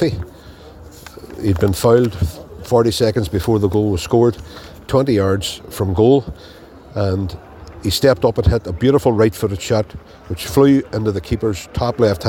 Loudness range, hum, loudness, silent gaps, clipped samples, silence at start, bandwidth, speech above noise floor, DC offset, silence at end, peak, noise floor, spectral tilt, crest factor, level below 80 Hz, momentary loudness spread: 2 LU; none; -17 LUFS; none; under 0.1%; 0 s; 17 kHz; 23 dB; under 0.1%; 0 s; 0 dBFS; -39 dBFS; -6.5 dB/octave; 16 dB; -34 dBFS; 20 LU